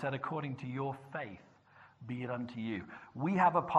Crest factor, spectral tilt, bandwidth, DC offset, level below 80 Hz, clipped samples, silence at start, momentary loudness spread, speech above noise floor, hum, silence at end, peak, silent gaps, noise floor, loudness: 24 dB; -8 dB/octave; 8.2 kHz; under 0.1%; -74 dBFS; under 0.1%; 0 s; 18 LU; 27 dB; none; 0 s; -12 dBFS; none; -62 dBFS; -37 LUFS